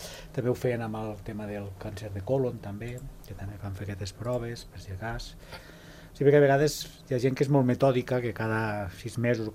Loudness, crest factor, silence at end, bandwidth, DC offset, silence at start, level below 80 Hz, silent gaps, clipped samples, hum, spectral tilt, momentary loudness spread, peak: -29 LUFS; 20 dB; 0 s; 15.5 kHz; under 0.1%; 0 s; -50 dBFS; none; under 0.1%; none; -6.5 dB/octave; 19 LU; -8 dBFS